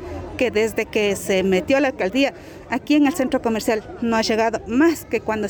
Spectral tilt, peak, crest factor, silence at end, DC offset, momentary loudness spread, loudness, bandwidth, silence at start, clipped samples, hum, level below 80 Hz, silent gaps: -4.5 dB/octave; -8 dBFS; 12 dB; 0 s; under 0.1%; 6 LU; -20 LUFS; over 20 kHz; 0 s; under 0.1%; none; -48 dBFS; none